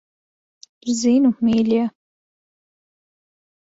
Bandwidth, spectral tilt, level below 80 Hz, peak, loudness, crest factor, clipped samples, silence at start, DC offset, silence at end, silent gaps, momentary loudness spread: 8 kHz; -5 dB/octave; -60 dBFS; -8 dBFS; -19 LUFS; 14 dB; under 0.1%; 0.85 s; under 0.1%; 1.9 s; none; 10 LU